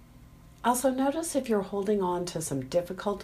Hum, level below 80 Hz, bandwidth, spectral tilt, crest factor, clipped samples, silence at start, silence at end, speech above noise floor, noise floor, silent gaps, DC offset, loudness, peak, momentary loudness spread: none; -56 dBFS; 15.5 kHz; -5 dB/octave; 18 dB; under 0.1%; 0 s; 0 s; 23 dB; -52 dBFS; none; under 0.1%; -29 LUFS; -12 dBFS; 6 LU